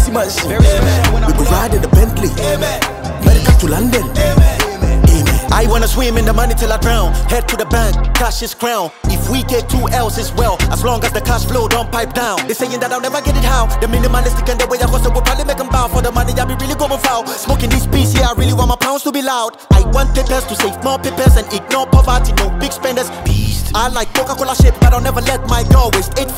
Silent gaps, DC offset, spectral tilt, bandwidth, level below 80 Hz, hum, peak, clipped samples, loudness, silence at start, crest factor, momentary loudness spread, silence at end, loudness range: none; under 0.1%; -5 dB/octave; 16.5 kHz; -14 dBFS; none; 0 dBFS; under 0.1%; -14 LUFS; 0 s; 12 dB; 6 LU; 0 s; 3 LU